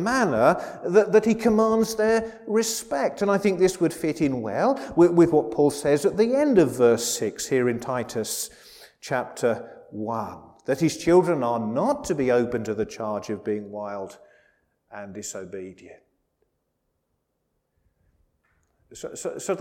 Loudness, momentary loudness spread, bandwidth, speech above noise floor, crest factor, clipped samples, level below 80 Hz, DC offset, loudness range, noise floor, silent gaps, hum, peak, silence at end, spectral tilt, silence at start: -23 LUFS; 16 LU; 17 kHz; 53 dB; 20 dB; under 0.1%; -56 dBFS; under 0.1%; 19 LU; -75 dBFS; none; none; -4 dBFS; 0 s; -5 dB/octave; 0 s